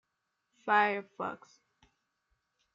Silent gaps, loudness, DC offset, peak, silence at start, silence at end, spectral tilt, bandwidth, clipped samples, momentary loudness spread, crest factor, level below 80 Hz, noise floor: none; -31 LUFS; under 0.1%; -14 dBFS; 0.65 s; 1.4 s; -5 dB/octave; 7.4 kHz; under 0.1%; 17 LU; 22 dB; -84 dBFS; -83 dBFS